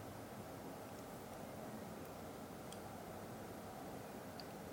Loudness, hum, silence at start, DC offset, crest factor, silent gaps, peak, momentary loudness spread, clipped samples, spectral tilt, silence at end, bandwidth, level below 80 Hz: -51 LUFS; none; 0 s; under 0.1%; 16 dB; none; -34 dBFS; 1 LU; under 0.1%; -5 dB/octave; 0 s; 17 kHz; -70 dBFS